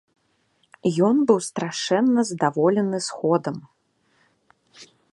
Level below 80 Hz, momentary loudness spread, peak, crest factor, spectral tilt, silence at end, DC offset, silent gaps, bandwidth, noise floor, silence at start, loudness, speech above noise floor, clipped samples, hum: -70 dBFS; 8 LU; -4 dBFS; 20 dB; -5.5 dB/octave; 0.3 s; under 0.1%; none; 11.5 kHz; -66 dBFS; 0.85 s; -22 LUFS; 46 dB; under 0.1%; none